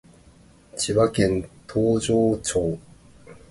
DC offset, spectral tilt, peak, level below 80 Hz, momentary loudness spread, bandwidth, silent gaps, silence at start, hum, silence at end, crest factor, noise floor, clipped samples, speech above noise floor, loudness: under 0.1%; -5 dB/octave; -8 dBFS; -46 dBFS; 9 LU; 11.5 kHz; none; 0.75 s; none; 0.15 s; 16 dB; -52 dBFS; under 0.1%; 31 dB; -23 LUFS